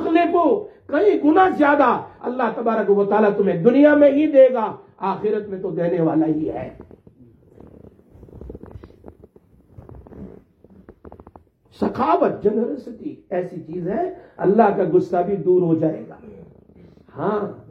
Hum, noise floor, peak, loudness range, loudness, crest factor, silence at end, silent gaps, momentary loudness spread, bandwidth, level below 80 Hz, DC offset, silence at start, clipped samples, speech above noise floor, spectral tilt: none; -52 dBFS; -2 dBFS; 10 LU; -19 LUFS; 18 dB; 0.1 s; none; 17 LU; 6 kHz; -54 dBFS; under 0.1%; 0 s; under 0.1%; 34 dB; -9 dB/octave